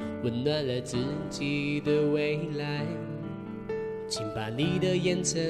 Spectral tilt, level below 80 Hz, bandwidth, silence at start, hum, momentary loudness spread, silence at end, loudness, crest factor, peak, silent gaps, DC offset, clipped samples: -5 dB/octave; -56 dBFS; 12.5 kHz; 0 s; none; 9 LU; 0 s; -30 LUFS; 14 dB; -16 dBFS; none; under 0.1%; under 0.1%